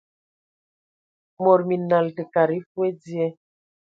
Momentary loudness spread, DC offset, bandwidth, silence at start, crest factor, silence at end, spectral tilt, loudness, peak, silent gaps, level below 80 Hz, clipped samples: 8 LU; under 0.1%; 7.2 kHz; 1.4 s; 20 dB; 0.55 s; -9 dB/octave; -22 LUFS; -4 dBFS; 2.66-2.75 s; -74 dBFS; under 0.1%